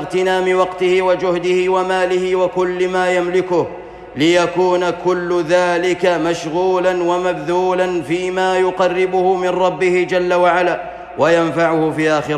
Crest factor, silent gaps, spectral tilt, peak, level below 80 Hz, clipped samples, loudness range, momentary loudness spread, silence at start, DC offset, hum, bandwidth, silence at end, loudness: 12 dB; none; -5.5 dB/octave; -4 dBFS; -50 dBFS; under 0.1%; 1 LU; 4 LU; 0 s; under 0.1%; none; 10.5 kHz; 0 s; -16 LUFS